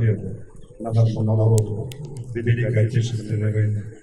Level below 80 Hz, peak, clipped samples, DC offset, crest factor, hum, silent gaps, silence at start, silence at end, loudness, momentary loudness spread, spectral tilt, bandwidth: -46 dBFS; -4 dBFS; under 0.1%; under 0.1%; 18 dB; none; none; 0 s; 0.05 s; -22 LUFS; 14 LU; -7.5 dB/octave; 10.5 kHz